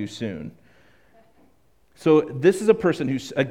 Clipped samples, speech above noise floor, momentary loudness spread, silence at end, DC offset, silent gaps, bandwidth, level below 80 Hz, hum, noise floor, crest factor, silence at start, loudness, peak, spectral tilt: under 0.1%; 41 dB; 14 LU; 0 s; 0.1%; none; 14.5 kHz; -60 dBFS; none; -62 dBFS; 20 dB; 0 s; -21 LUFS; -4 dBFS; -6.5 dB/octave